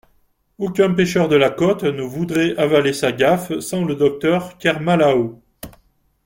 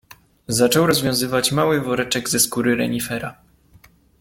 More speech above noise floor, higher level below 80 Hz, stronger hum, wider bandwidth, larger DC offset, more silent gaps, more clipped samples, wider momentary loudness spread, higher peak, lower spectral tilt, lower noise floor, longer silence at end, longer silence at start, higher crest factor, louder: first, 43 dB vs 33 dB; about the same, -52 dBFS vs -52 dBFS; neither; about the same, 17 kHz vs 17 kHz; neither; neither; neither; first, 11 LU vs 8 LU; about the same, -2 dBFS vs -2 dBFS; first, -5.5 dB/octave vs -3.5 dB/octave; first, -60 dBFS vs -52 dBFS; second, 0.55 s vs 0.9 s; about the same, 0.6 s vs 0.5 s; about the same, 16 dB vs 18 dB; about the same, -18 LUFS vs -19 LUFS